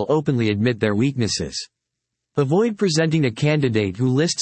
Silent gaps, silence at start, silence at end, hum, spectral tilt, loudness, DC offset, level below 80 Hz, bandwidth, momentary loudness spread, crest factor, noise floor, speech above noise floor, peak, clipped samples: none; 0 s; 0 s; none; -5.5 dB/octave; -20 LUFS; under 0.1%; -56 dBFS; 8.8 kHz; 7 LU; 14 dB; -80 dBFS; 61 dB; -6 dBFS; under 0.1%